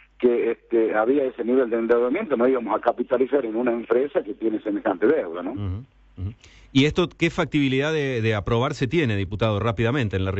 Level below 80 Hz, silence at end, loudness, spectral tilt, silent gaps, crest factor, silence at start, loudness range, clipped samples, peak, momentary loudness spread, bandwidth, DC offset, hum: -48 dBFS; 0 s; -23 LUFS; -7 dB/octave; none; 14 dB; 0.2 s; 3 LU; under 0.1%; -8 dBFS; 7 LU; 8.2 kHz; under 0.1%; none